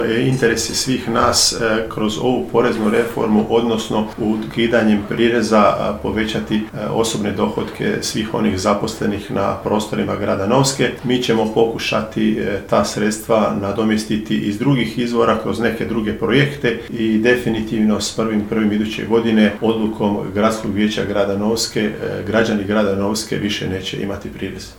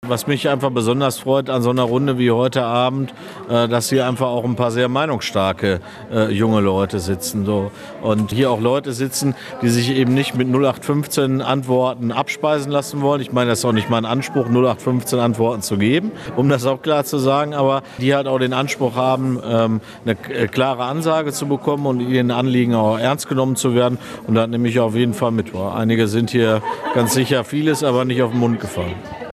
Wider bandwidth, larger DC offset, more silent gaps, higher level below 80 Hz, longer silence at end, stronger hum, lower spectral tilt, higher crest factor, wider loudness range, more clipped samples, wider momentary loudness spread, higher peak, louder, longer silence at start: first, 18 kHz vs 14 kHz; neither; neither; first, -42 dBFS vs -54 dBFS; about the same, 0.05 s vs 0 s; neither; about the same, -4.5 dB/octave vs -5.5 dB/octave; about the same, 16 dB vs 16 dB; about the same, 3 LU vs 1 LU; neither; about the same, 6 LU vs 5 LU; about the same, 0 dBFS vs -2 dBFS; about the same, -18 LUFS vs -18 LUFS; about the same, 0 s vs 0 s